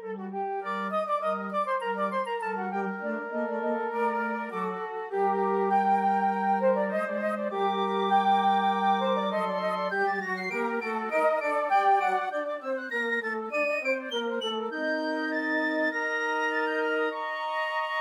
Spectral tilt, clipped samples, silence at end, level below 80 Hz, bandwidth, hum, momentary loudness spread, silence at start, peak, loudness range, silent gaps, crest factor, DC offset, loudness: -5.5 dB/octave; under 0.1%; 0 s; under -90 dBFS; 12.5 kHz; none; 7 LU; 0 s; -12 dBFS; 4 LU; none; 14 dB; under 0.1%; -28 LUFS